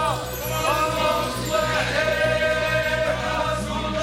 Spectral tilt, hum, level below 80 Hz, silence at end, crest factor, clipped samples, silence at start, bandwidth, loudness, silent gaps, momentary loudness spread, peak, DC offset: -4 dB/octave; none; -38 dBFS; 0 s; 14 dB; under 0.1%; 0 s; 17 kHz; -22 LUFS; none; 4 LU; -10 dBFS; under 0.1%